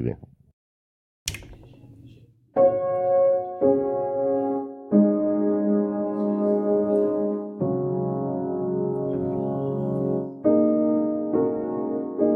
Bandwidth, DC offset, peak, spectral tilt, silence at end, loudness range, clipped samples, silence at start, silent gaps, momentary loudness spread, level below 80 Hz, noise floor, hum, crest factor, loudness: 14 kHz; under 0.1%; -6 dBFS; -8 dB/octave; 0 s; 4 LU; under 0.1%; 0 s; 0.53-1.26 s; 8 LU; -58 dBFS; -51 dBFS; none; 18 dB; -24 LUFS